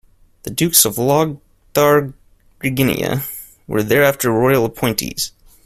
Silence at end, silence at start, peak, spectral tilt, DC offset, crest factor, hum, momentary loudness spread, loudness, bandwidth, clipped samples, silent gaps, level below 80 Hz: 0.35 s; 0.45 s; 0 dBFS; -4 dB/octave; under 0.1%; 18 dB; none; 14 LU; -16 LUFS; 16 kHz; under 0.1%; none; -46 dBFS